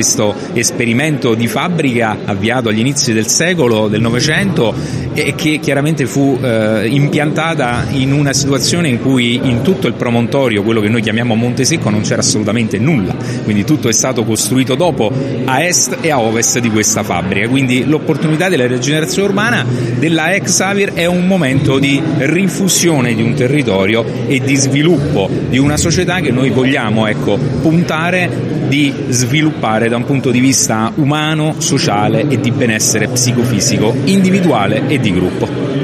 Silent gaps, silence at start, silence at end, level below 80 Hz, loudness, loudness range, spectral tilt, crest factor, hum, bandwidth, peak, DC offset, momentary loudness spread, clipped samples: none; 0 s; 0 s; -42 dBFS; -12 LUFS; 1 LU; -4.5 dB/octave; 12 dB; none; 15.5 kHz; 0 dBFS; under 0.1%; 4 LU; under 0.1%